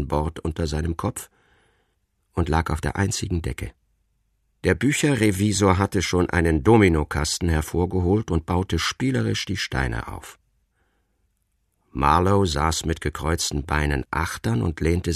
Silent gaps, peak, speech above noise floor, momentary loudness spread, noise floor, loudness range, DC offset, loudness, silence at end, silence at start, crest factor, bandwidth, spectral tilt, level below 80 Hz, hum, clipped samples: none; -2 dBFS; 49 dB; 9 LU; -70 dBFS; 7 LU; under 0.1%; -23 LUFS; 0 s; 0 s; 20 dB; 14 kHz; -5 dB/octave; -34 dBFS; none; under 0.1%